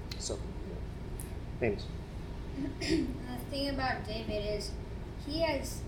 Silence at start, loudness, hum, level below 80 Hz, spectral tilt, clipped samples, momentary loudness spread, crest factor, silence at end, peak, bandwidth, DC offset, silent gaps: 0 s; -37 LUFS; none; -44 dBFS; -5 dB/octave; under 0.1%; 10 LU; 18 dB; 0 s; -16 dBFS; 18 kHz; under 0.1%; none